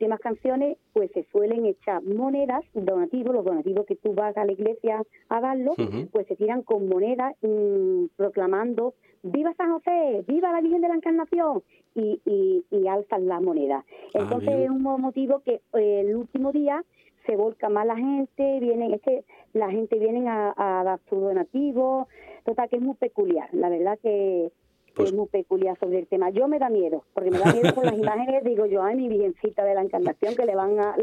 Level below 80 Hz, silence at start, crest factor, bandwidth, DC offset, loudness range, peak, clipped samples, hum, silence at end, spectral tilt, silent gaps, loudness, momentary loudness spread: -68 dBFS; 0 s; 22 dB; 9.8 kHz; under 0.1%; 3 LU; -2 dBFS; under 0.1%; none; 0 s; -7.5 dB/octave; none; -25 LUFS; 5 LU